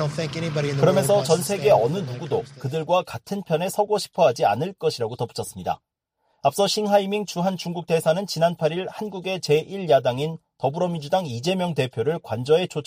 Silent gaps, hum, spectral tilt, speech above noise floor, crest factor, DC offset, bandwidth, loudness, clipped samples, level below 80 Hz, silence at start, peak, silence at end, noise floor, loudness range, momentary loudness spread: none; none; -5 dB/octave; 49 dB; 18 dB; under 0.1%; 15.5 kHz; -23 LUFS; under 0.1%; -60 dBFS; 0 s; -6 dBFS; 0.05 s; -71 dBFS; 3 LU; 10 LU